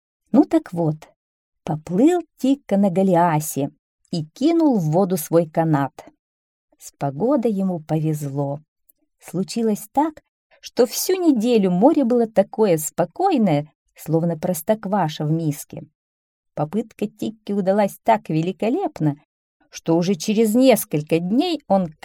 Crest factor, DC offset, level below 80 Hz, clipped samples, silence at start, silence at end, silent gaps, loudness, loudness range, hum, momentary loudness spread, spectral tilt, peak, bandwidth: 18 dB; under 0.1%; -62 dBFS; under 0.1%; 0.35 s; 0.15 s; 1.16-1.52 s, 3.79-3.99 s, 6.19-6.68 s, 8.68-8.76 s, 10.29-10.50 s, 13.75-13.86 s, 15.95-16.43 s, 19.25-19.60 s; -20 LUFS; 6 LU; none; 12 LU; -6.5 dB/octave; -2 dBFS; 18.5 kHz